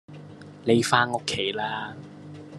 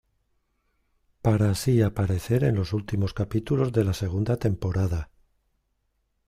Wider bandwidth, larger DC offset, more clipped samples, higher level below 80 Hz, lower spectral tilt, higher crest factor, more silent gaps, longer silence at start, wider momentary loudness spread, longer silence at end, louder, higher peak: second, 12.5 kHz vs 15.5 kHz; neither; neither; second, -64 dBFS vs -46 dBFS; second, -4 dB/octave vs -7.5 dB/octave; first, 24 dB vs 16 dB; neither; second, 0.1 s vs 1.25 s; first, 23 LU vs 6 LU; second, 0 s vs 1.25 s; about the same, -25 LUFS vs -25 LUFS; first, -4 dBFS vs -10 dBFS